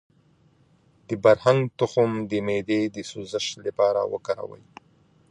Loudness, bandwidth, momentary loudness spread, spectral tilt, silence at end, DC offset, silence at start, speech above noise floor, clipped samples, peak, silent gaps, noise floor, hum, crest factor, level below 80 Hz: -24 LUFS; 10.5 kHz; 12 LU; -5.5 dB/octave; 0.75 s; under 0.1%; 1.1 s; 37 dB; under 0.1%; -4 dBFS; none; -60 dBFS; none; 20 dB; -62 dBFS